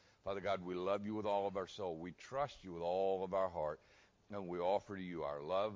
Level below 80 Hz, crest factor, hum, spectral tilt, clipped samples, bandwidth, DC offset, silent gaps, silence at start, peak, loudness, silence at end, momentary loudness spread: -68 dBFS; 16 dB; none; -6.5 dB/octave; under 0.1%; 7.6 kHz; under 0.1%; none; 0.25 s; -24 dBFS; -41 LUFS; 0 s; 8 LU